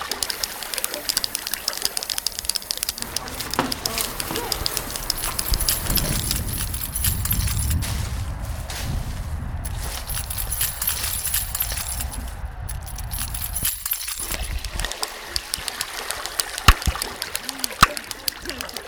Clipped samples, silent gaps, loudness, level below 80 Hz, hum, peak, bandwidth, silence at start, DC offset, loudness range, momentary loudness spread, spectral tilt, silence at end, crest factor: under 0.1%; none; -24 LUFS; -32 dBFS; none; -2 dBFS; over 20 kHz; 0 s; under 0.1%; 4 LU; 9 LU; -2 dB/octave; 0 s; 24 dB